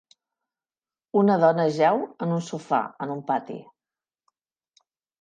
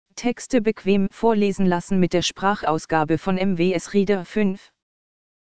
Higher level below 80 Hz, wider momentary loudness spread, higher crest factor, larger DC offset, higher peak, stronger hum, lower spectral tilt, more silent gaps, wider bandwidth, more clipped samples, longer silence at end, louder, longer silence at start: second, -78 dBFS vs -48 dBFS; first, 12 LU vs 4 LU; about the same, 18 dB vs 18 dB; second, under 0.1% vs 2%; second, -8 dBFS vs -4 dBFS; neither; about the same, -7 dB/octave vs -6 dB/octave; neither; about the same, 9.2 kHz vs 9.4 kHz; neither; first, 1.6 s vs 0.65 s; second, -24 LUFS vs -21 LUFS; first, 1.15 s vs 0.05 s